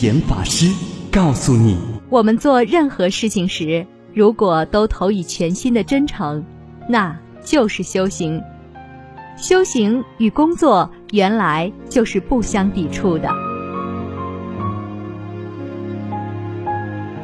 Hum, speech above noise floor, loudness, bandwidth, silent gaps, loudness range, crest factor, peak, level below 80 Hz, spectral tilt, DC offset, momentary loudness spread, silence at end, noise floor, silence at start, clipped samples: none; 21 dB; -18 LUFS; 11 kHz; none; 8 LU; 16 dB; -2 dBFS; -36 dBFS; -5.5 dB/octave; under 0.1%; 14 LU; 0 s; -37 dBFS; 0 s; under 0.1%